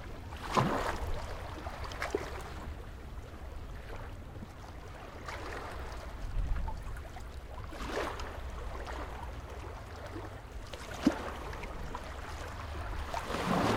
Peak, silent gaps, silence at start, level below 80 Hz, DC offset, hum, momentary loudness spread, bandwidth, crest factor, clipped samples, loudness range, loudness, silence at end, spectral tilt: -12 dBFS; none; 0 s; -44 dBFS; under 0.1%; none; 14 LU; 16.5 kHz; 26 dB; under 0.1%; 7 LU; -40 LUFS; 0 s; -5.5 dB/octave